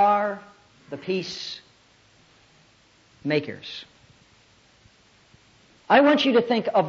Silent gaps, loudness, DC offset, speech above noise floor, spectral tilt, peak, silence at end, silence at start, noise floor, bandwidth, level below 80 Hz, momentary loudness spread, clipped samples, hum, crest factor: none; -23 LUFS; under 0.1%; 36 dB; -5.5 dB/octave; -6 dBFS; 0 s; 0 s; -58 dBFS; 7.6 kHz; -70 dBFS; 21 LU; under 0.1%; none; 20 dB